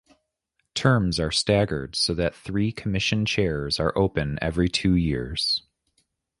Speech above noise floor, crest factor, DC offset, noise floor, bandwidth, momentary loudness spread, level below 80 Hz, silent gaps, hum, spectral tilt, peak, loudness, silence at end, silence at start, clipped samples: 52 dB; 20 dB; under 0.1%; -76 dBFS; 11.5 kHz; 5 LU; -40 dBFS; none; none; -5 dB/octave; -4 dBFS; -24 LUFS; 0.8 s; 0.75 s; under 0.1%